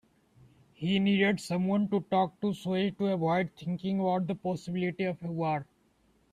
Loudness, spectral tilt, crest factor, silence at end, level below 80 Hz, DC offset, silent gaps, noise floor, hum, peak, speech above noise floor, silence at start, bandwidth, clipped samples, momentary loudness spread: -30 LUFS; -7 dB/octave; 16 dB; 0.7 s; -68 dBFS; under 0.1%; none; -68 dBFS; none; -14 dBFS; 39 dB; 0.8 s; 11 kHz; under 0.1%; 7 LU